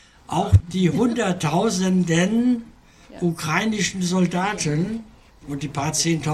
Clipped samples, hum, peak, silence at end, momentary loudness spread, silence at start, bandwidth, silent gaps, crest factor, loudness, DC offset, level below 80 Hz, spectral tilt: under 0.1%; none; -4 dBFS; 0 s; 8 LU; 0.3 s; 13 kHz; none; 18 dB; -21 LUFS; under 0.1%; -40 dBFS; -5 dB/octave